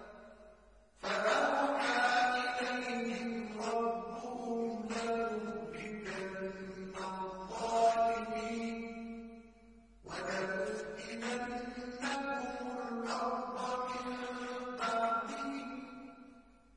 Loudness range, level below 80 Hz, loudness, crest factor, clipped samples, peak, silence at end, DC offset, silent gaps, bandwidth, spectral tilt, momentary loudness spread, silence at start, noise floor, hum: 6 LU; -66 dBFS; -37 LUFS; 18 dB; under 0.1%; -18 dBFS; 0.3 s; under 0.1%; none; 10.5 kHz; -3.5 dB/octave; 15 LU; 0 s; -62 dBFS; none